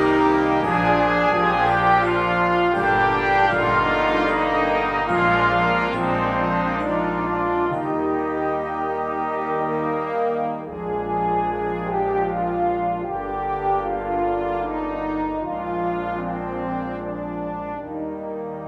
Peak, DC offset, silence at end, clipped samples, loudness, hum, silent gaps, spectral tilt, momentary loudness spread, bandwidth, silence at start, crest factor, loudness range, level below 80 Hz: -4 dBFS; under 0.1%; 0 s; under 0.1%; -22 LUFS; none; none; -7 dB/octave; 9 LU; 9.6 kHz; 0 s; 16 dB; 7 LU; -42 dBFS